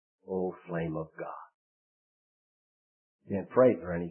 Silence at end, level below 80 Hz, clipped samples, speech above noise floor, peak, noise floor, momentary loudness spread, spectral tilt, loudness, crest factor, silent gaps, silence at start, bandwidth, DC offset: 0 s; -64 dBFS; under 0.1%; over 60 dB; -10 dBFS; under -90 dBFS; 17 LU; -5 dB/octave; -31 LUFS; 24 dB; 1.54-3.19 s; 0.3 s; 3.1 kHz; under 0.1%